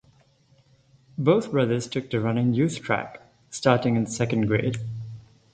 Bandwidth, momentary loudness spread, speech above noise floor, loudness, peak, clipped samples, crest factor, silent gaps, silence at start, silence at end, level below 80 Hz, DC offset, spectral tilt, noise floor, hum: 9.4 kHz; 17 LU; 37 dB; -24 LUFS; -4 dBFS; under 0.1%; 22 dB; none; 1.2 s; 0.35 s; -56 dBFS; under 0.1%; -6.5 dB/octave; -60 dBFS; none